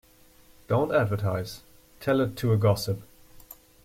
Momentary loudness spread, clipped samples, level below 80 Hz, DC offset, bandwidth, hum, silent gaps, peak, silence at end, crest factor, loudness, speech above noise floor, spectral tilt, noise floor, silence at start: 12 LU; under 0.1%; -56 dBFS; under 0.1%; 16 kHz; none; none; -10 dBFS; 0.3 s; 18 dB; -26 LUFS; 31 dB; -7 dB/octave; -56 dBFS; 0.7 s